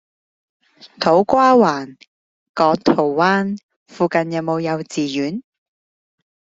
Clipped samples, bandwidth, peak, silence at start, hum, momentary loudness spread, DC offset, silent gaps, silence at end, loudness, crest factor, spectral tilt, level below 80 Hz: under 0.1%; 7.8 kHz; 0 dBFS; 0.85 s; none; 14 LU; under 0.1%; 2.08-2.54 s, 3.63-3.69 s, 3.76-3.86 s; 1.15 s; -17 LUFS; 18 dB; -6 dB/octave; -58 dBFS